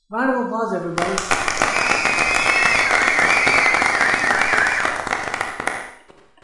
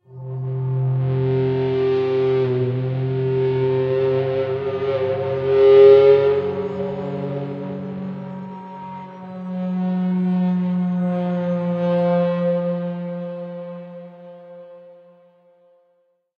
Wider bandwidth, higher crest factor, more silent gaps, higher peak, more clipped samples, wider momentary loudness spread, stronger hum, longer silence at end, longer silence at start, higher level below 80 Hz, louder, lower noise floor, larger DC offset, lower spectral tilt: first, 11.5 kHz vs 5.4 kHz; about the same, 18 dB vs 18 dB; neither; about the same, -2 dBFS vs -2 dBFS; neither; second, 9 LU vs 17 LU; neither; second, 0.5 s vs 1.45 s; about the same, 0.1 s vs 0.1 s; first, -46 dBFS vs -58 dBFS; about the same, -17 LUFS vs -19 LUFS; second, -48 dBFS vs -64 dBFS; neither; second, -2 dB/octave vs -10 dB/octave